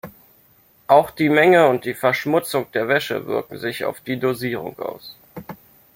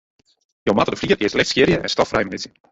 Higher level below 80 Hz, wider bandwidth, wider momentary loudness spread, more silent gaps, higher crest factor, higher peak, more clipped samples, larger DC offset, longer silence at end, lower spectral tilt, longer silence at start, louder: second, -62 dBFS vs -46 dBFS; first, 16.5 kHz vs 8.2 kHz; first, 23 LU vs 10 LU; neither; about the same, 20 dB vs 18 dB; about the same, 0 dBFS vs -2 dBFS; neither; neither; first, 0.4 s vs 0.25 s; about the same, -5.5 dB/octave vs -4.5 dB/octave; second, 0.05 s vs 0.65 s; about the same, -19 LUFS vs -19 LUFS